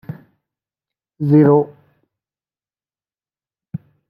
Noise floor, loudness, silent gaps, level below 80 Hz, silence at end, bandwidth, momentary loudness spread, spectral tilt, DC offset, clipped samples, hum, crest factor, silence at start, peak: under -90 dBFS; -14 LUFS; none; -64 dBFS; 0.35 s; 4.5 kHz; 23 LU; -12.5 dB/octave; under 0.1%; under 0.1%; none; 18 dB; 0.1 s; -2 dBFS